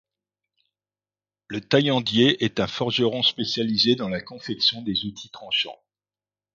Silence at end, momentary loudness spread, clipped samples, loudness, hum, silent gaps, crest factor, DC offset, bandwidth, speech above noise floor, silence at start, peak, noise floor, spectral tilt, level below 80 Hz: 0.8 s; 13 LU; under 0.1%; -22 LUFS; 50 Hz at -55 dBFS; none; 20 dB; under 0.1%; 7.4 kHz; over 67 dB; 1.5 s; -4 dBFS; under -90 dBFS; -5 dB/octave; -60 dBFS